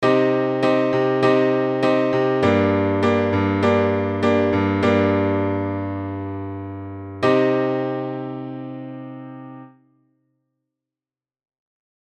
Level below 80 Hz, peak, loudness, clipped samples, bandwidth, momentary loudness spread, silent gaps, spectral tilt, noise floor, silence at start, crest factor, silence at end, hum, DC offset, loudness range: -64 dBFS; -2 dBFS; -19 LUFS; under 0.1%; 8.8 kHz; 16 LU; none; -7.5 dB/octave; under -90 dBFS; 0 s; 18 dB; 2.4 s; none; under 0.1%; 15 LU